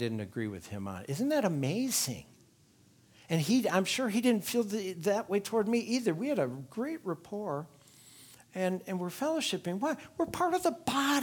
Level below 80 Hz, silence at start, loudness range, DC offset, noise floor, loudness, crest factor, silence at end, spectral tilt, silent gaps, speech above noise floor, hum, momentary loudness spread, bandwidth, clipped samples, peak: -70 dBFS; 0 s; 6 LU; under 0.1%; -63 dBFS; -32 LUFS; 20 dB; 0 s; -4.5 dB/octave; none; 32 dB; none; 10 LU; 19.5 kHz; under 0.1%; -14 dBFS